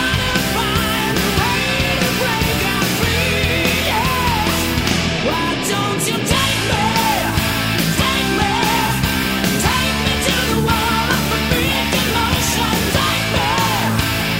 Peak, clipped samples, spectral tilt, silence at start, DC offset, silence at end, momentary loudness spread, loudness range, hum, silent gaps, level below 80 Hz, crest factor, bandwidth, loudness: 0 dBFS; under 0.1%; -3.5 dB/octave; 0 s; 0.3%; 0 s; 2 LU; 1 LU; none; none; -30 dBFS; 16 dB; 16.5 kHz; -16 LUFS